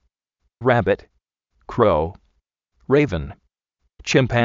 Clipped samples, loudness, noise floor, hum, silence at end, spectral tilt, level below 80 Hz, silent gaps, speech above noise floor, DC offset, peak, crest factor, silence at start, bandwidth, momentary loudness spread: under 0.1%; -20 LUFS; -73 dBFS; none; 0 s; -5 dB/octave; -42 dBFS; none; 55 dB; under 0.1%; -2 dBFS; 20 dB; 0.6 s; 7.6 kHz; 12 LU